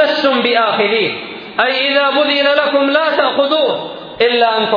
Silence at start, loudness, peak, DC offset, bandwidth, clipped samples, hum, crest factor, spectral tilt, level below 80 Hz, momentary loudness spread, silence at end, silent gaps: 0 s; -13 LUFS; 0 dBFS; under 0.1%; 5.2 kHz; under 0.1%; none; 14 dB; -5 dB/octave; -60 dBFS; 6 LU; 0 s; none